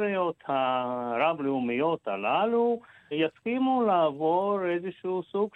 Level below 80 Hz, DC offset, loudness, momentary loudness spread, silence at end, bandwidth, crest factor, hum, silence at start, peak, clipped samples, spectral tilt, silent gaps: -76 dBFS; under 0.1%; -28 LUFS; 7 LU; 0.05 s; 4.1 kHz; 14 dB; none; 0 s; -12 dBFS; under 0.1%; -8 dB/octave; none